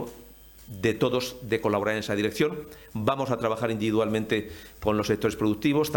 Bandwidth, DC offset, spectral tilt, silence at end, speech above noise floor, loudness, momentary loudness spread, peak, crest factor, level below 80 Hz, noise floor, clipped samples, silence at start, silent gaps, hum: 17 kHz; under 0.1%; -5.5 dB/octave; 0 s; 23 dB; -27 LUFS; 11 LU; -8 dBFS; 18 dB; -54 dBFS; -49 dBFS; under 0.1%; 0 s; none; none